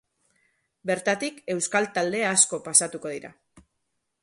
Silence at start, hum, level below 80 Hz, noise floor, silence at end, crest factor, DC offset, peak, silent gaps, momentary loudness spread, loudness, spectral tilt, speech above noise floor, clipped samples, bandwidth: 0.85 s; none; -72 dBFS; -77 dBFS; 0.65 s; 24 dB; under 0.1%; -4 dBFS; none; 15 LU; -23 LUFS; -2 dB/octave; 52 dB; under 0.1%; 11.5 kHz